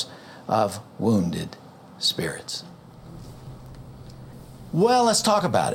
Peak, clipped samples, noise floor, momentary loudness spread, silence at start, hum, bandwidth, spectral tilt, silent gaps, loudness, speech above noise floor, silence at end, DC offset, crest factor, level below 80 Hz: -8 dBFS; under 0.1%; -43 dBFS; 24 LU; 0 s; none; 17 kHz; -4.5 dB/octave; none; -23 LUFS; 21 dB; 0 s; under 0.1%; 18 dB; -54 dBFS